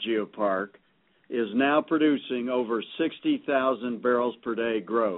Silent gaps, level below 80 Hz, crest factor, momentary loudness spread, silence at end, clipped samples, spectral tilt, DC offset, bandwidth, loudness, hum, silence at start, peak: none; -72 dBFS; 16 dB; 7 LU; 0 s; under 0.1%; -3 dB/octave; under 0.1%; 4 kHz; -27 LUFS; none; 0 s; -10 dBFS